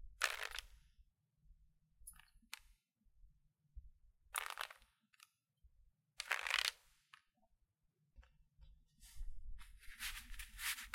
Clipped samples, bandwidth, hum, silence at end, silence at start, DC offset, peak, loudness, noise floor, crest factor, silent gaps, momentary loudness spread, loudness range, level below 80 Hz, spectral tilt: under 0.1%; 16.5 kHz; none; 0 s; 0 s; under 0.1%; -16 dBFS; -43 LUFS; -83 dBFS; 34 dB; none; 26 LU; 18 LU; -60 dBFS; 1 dB/octave